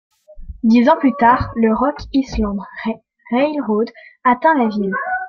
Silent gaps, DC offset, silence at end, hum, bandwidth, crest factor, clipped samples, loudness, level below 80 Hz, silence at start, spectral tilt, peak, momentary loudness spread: none; under 0.1%; 0 s; none; 6.8 kHz; 16 dB; under 0.1%; -17 LUFS; -38 dBFS; 0.3 s; -7 dB/octave; -2 dBFS; 12 LU